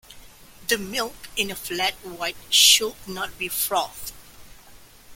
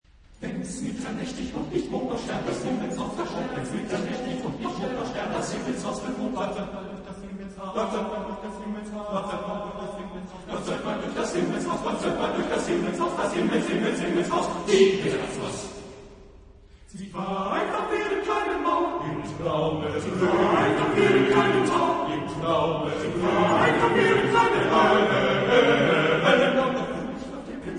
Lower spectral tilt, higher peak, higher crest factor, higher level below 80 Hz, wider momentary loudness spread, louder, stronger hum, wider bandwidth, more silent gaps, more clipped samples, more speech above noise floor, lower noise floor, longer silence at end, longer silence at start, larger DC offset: second, 0 dB/octave vs -5 dB/octave; first, -2 dBFS vs -6 dBFS; about the same, 22 dB vs 20 dB; about the same, -52 dBFS vs -50 dBFS; about the same, 17 LU vs 15 LU; first, -21 LUFS vs -25 LUFS; neither; first, 17 kHz vs 10.5 kHz; neither; neither; about the same, 24 dB vs 22 dB; about the same, -48 dBFS vs -50 dBFS; about the same, 0 s vs 0 s; second, 0.1 s vs 0.3 s; neither